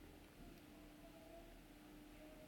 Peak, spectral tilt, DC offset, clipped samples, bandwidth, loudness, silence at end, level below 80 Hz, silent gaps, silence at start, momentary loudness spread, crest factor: -46 dBFS; -5 dB/octave; under 0.1%; under 0.1%; 17.5 kHz; -61 LUFS; 0 s; -68 dBFS; none; 0 s; 2 LU; 14 dB